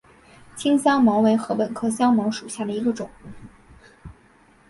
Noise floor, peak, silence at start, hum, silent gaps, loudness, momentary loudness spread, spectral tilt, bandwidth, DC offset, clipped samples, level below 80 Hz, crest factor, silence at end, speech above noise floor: -55 dBFS; -6 dBFS; 0.55 s; none; none; -21 LUFS; 12 LU; -5.5 dB/octave; 11.5 kHz; under 0.1%; under 0.1%; -56 dBFS; 16 dB; 0.6 s; 34 dB